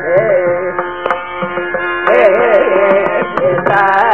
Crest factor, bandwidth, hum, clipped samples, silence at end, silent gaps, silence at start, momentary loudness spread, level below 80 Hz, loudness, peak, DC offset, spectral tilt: 12 dB; 5.8 kHz; none; under 0.1%; 0 s; none; 0 s; 9 LU; -50 dBFS; -12 LUFS; 0 dBFS; 1%; -7 dB/octave